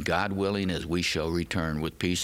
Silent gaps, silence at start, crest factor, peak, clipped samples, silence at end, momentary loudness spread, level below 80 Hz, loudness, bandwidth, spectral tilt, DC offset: none; 0 s; 18 dB; -10 dBFS; under 0.1%; 0 s; 3 LU; -48 dBFS; -29 LUFS; 16.5 kHz; -4.5 dB/octave; under 0.1%